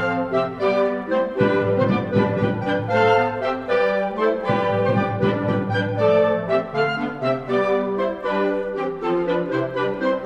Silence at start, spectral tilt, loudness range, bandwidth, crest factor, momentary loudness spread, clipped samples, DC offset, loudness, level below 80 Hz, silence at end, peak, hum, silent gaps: 0 s; -8 dB/octave; 2 LU; 8.4 kHz; 14 dB; 5 LU; under 0.1%; under 0.1%; -21 LUFS; -52 dBFS; 0 s; -6 dBFS; none; none